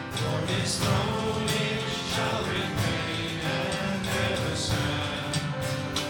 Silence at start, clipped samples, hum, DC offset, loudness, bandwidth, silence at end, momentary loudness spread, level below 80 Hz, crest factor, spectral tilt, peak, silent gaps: 0 s; under 0.1%; none; under 0.1%; -28 LUFS; 19 kHz; 0 s; 3 LU; -48 dBFS; 16 dB; -4.5 dB/octave; -12 dBFS; none